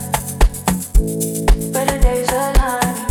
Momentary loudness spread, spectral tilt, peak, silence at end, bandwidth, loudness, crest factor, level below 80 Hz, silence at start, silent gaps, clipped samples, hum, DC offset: 3 LU; -4.5 dB/octave; -2 dBFS; 0 s; 18 kHz; -18 LUFS; 14 dB; -18 dBFS; 0 s; none; under 0.1%; none; under 0.1%